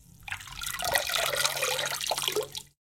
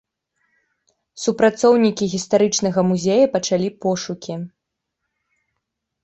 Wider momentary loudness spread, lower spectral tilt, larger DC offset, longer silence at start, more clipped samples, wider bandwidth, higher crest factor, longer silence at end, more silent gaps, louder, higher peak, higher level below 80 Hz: about the same, 12 LU vs 13 LU; second, 0 dB/octave vs -5 dB/octave; neither; second, 0.2 s vs 1.15 s; neither; first, 17 kHz vs 8.2 kHz; first, 24 dB vs 18 dB; second, 0.2 s vs 1.55 s; neither; second, -28 LUFS vs -18 LUFS; second, -8 dBFS vs -2 dBFS; about the same, -56 dBFS vs -60 dBFS